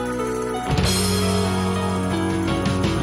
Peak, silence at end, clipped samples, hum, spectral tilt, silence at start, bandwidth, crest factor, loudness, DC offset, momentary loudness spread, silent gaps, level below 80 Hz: -8 dBFS; 0 s; under 0.1%; none; -5 dB/octave; 0 s; 16 kHz; 14 dB; -21 LUFS; under 0.1%; 5 LU; none; -36 dBFS